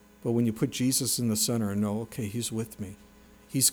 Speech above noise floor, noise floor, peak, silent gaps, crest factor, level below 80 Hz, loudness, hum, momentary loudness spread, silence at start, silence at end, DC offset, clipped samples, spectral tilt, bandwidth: 25 dB; -54 dBFS; -10 dBFS; none; 20 dB; -60 dBFS; -28 LUFS; none; 10 LU; 0.25 s; 0 s; under 0.1%; under 0.1%; -4 dB/octave; over 20 kHz